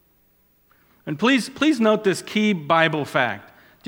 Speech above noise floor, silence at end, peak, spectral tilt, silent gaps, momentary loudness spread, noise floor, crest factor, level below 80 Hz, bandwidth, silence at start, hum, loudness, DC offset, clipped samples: 41 dB; 0.5 s; -2 dBFS; -5 dB/octave; none; 10 LU; -61 dBFS; 22 dB; -66 dBFS; 17 kHz; 1.05 s; none; -20 LUFS; under 0.1%; under 0.1%